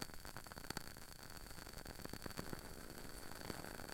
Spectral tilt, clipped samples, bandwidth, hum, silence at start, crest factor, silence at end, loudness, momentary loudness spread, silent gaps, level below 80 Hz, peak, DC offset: -3.5 dB/octave; under 0.1%; 17 kHz; none; 0 s; 28 dB; 0 s; -51 LUFS; 5 LU; none; -58 dBFS; -24 dBFS; under 0.1%